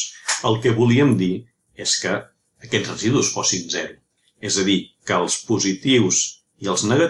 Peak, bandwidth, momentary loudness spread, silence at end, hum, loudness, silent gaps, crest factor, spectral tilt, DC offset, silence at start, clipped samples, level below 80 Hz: -4 dBFS; 11.5 kHz; 10 LU; 0 s; none; -20 LUFS; none; 16 dB; -3.5 dB/octave; under 0.1%; 0 s; under 0.1%; -58 dBFS